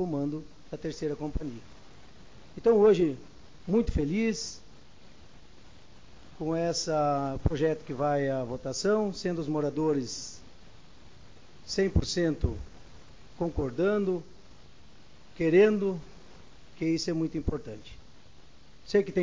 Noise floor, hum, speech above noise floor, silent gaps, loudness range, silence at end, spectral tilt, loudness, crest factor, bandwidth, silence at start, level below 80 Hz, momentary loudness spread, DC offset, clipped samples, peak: -56 dBFS; none; 28 dB; none; 5 LU; 0 s; -6 dB/octave; -29 LUFS; 22 dB; 7.6 kHz; 0 s; -44 dBFS; 18 LU; 0.4%; under 0.1%; -8 dBFS